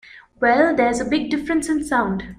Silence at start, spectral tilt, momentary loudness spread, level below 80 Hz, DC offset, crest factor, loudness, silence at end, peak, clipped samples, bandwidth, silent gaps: 0.15 s; -5 dB/octave; 6 LU; -46 dBFS; under 0.1%; 16 dB; -19 LUFS; 0.05 s; -4 dBFS; under 0.1%; 15 kHz; none